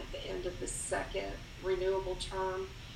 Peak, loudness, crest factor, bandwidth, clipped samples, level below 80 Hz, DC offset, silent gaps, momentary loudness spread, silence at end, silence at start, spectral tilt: -22 dBFS; -37 LUFS; 16 dB; 15.5 kHz; under 0.1%; -48 dBFS; under 0.1%; none; 8 LU; 0 s; 0 s; -3.5 dB/octave